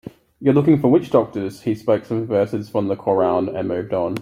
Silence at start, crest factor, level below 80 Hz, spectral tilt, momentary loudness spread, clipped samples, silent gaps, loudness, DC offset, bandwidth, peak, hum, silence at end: 0.05 s; 16 dB; -58 dBFS; -9 dB/octave; 9 LU; under 0.1%; none; -19 LUFS; under 0.1%; 15 kHz; -2 dBFS; none; 0 s